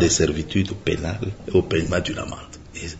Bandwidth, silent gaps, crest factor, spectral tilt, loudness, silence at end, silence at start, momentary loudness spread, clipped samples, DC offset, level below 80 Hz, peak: 8 kHz; none; 18 dB; -4.5 dB/octave; -23 LUFS; 0 s; 0 s; 14 LU; under 0.1%; under 0.1%; -40 dBFS; -4 dBFS